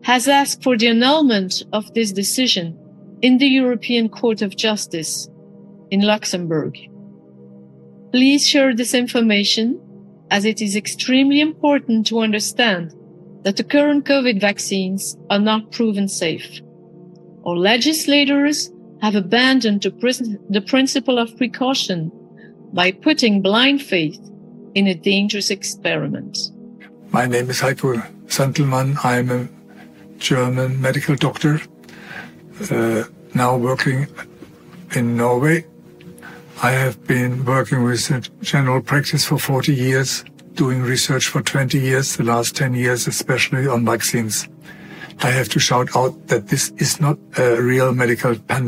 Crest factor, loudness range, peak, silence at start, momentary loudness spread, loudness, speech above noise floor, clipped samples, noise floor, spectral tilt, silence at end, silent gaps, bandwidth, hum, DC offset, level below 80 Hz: 18 dB; 4 LU; 0 dBFS; 0.05 s; 10 LU; -18 LUFS; 25 dB; under 0.1%; -43 dBFS; -4.5 dB/octave; 0 s; none; 16 kHz; none; under 0.1%; -60 dBFS